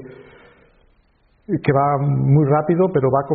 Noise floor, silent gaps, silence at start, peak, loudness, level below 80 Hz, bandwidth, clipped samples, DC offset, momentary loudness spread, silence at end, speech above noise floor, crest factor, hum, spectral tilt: -58 dBFS; none; 0 s; -2 dBFS; -17 LUFS; -50 dBFS; 4.5 kHz; under 0.1%; under 0.1%; 5 LU; 0 s; 42 dB; 16 dB; none; -9.5 dB/octave